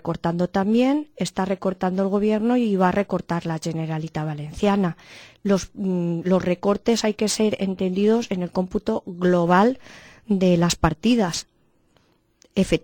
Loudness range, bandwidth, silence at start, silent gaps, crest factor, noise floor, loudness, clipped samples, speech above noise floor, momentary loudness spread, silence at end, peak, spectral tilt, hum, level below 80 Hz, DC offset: 3 LU; 18 kHz; 0.05 s; none; 18 dB; -62 dBFS; -22 LUFS; under 0.1%; 41 dB; 8 LU; 0.05 s; -4 dBFS; -6 dB/octave; none; -46 dBFS; under 0.1%